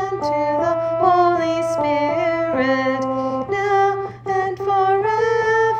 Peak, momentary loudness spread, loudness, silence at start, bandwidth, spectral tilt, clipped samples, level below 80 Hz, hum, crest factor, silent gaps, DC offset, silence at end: -4 dBFS; 6 LU; -19 LUFS; 0 s; 9.4 kHz; -6 dB/octave; under 0.1%; -54 dBFS; none; 14 dB; none; under 0.1%; 0 s